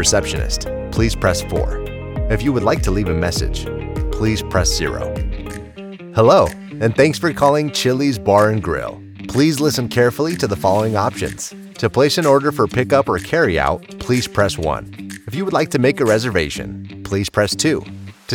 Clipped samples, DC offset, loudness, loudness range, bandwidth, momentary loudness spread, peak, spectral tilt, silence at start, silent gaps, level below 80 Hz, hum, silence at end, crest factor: under 0.1%; under 0.1%; -17 LUFS; 4 LU; 19 kHz; 12 LU; -2 dBFS; -5 dB/octave; 0 s; none; -30 dBFS; none; 0 s; 16 dB